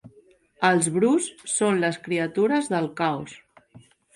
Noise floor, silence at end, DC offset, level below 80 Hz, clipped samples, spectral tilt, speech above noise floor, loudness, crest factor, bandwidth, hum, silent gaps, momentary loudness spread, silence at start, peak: -57 dBFS; 0.35 s; under 0.1%; -68 dBFS; under 0.1%; -4.5 dB/octave; 34 dB; -23 LUFS; 18 dB; 11.5 kHz; none; none; 6 LU; 0.05 s; -8 dBFS